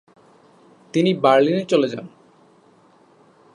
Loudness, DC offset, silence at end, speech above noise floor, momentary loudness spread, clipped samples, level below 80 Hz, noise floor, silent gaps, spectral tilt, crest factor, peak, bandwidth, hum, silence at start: -18 LUFS; under 0.1%; 1.45 s; 36 dB; 10 LU; under 0.1%; -72 dBFS; -54 dBFS; none; -6.5 dB/octave; 20 dB; -2 dBFS; 10.5 kHz; none; 0.95 s